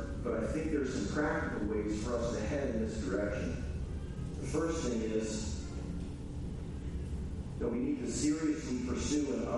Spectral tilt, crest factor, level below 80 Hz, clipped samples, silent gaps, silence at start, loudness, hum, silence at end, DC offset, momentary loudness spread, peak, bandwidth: -6 dB/octave; 14 dB; -44 dBFS; under 0.1%; none; 0 s; -36 LUFS; none; 0 s; under 0.1%; 8 LU; -20 dBFS; 11.5 kHz